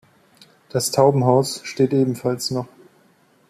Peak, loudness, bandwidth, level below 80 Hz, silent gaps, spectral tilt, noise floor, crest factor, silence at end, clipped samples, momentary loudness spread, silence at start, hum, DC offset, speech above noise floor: -2 dBFS; -20 LUFS; 14.5 kHz; -60 dBFS; none; -5.5 dB/octave; -57 dBFS; 18 dB; 0.85 s; under 0.1%; 11 LU; 0.75 s; none; under 0.1%; 38 dB